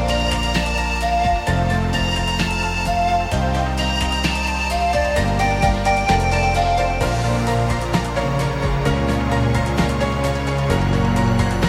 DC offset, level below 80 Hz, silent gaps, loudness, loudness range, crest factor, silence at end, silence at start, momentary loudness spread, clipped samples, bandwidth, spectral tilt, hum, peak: under 0.1%; -26 dBFS; none; -19 LUFS; 1 LU; 16 dB; 0 s; 0 s; 3 LU; under 0.1%; 16 kHz; -5.5 dB/octave; none; -4 dBFS